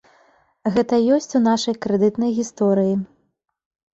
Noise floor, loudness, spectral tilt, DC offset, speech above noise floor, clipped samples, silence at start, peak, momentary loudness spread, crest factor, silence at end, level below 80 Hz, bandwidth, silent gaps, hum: -70 dBFS; -20 LUFS; -6 dB/octave; under 0.1%; 51 dB; under 0.1%; 0.65 s; -6 dBFS; 6 LU; 14 dB; 0.9 s; -60 dBFS; 8 kHz; none; none